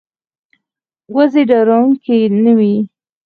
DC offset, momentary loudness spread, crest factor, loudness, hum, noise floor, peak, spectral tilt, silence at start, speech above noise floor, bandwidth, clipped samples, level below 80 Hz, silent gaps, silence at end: under 0.1%; 8 LU; 12 dB; -12 LUFS; none; -81 dBFS; 0 dBFS; -9.5 dB/octave; 1.1 s; 70 dB; 4.8 kHz; under 0.1%; -64 dBFS; none; 0.4 s